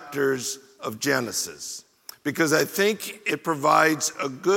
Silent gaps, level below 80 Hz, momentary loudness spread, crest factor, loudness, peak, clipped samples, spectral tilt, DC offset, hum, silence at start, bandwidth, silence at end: none; -72 dBFS; 16 LU; 20 dB; -24 LUFS; -4 dBFS; under 0.1%; -3 dB/octave; under 0.1%; none; 0 s; 17 kHz; 0 s